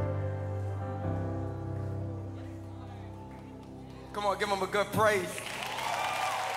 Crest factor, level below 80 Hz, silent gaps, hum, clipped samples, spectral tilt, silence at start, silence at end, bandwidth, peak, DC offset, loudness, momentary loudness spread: 20 dB; -56 dBFS; none; none; under 0.1%; -5 dB/octave; 0 s; 0 s; 16 kHz; -14 dBFS; under 0.1%; -33 LUFS; 18 LU